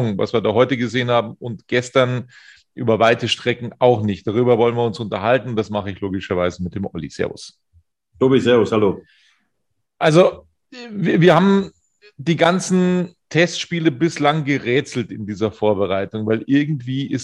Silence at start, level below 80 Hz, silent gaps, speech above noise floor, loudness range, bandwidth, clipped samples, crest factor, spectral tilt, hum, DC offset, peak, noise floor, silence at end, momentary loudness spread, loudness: 0 s; -56 dBFS; none; 58 dB; 4 LU; 11 kHz; under 0.1%; 18 dB; -6 dB/octave; none; under 0.1%; 0 dBFS; -75 dBFS; 0 s; 12 LU; -18 LUFS